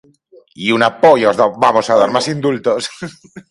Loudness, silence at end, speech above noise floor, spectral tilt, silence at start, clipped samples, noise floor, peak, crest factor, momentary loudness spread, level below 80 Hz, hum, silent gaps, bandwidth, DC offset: -13 LUFS; 0.1 s; 34 dB; -4.5 dB/octave; 0.6 s; under 0.1%; -47 dBFS; 0 dBFS; 14 dB; 12 LU; -56 dBFS; none; none; 11.5 kHz; under 0.1%